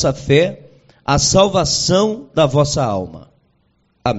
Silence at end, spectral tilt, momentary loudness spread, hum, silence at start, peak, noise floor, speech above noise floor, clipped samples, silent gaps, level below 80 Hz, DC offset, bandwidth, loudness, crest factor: 0 s; -4.5 dB/octave; 11 LU; none; 0 s; 0 dBFS; -61 dBFS; 46 dB; under 0.1%; none; -38 dBFS; under 0.1%; 8.2 kHz; -15 LUFS; 16 dB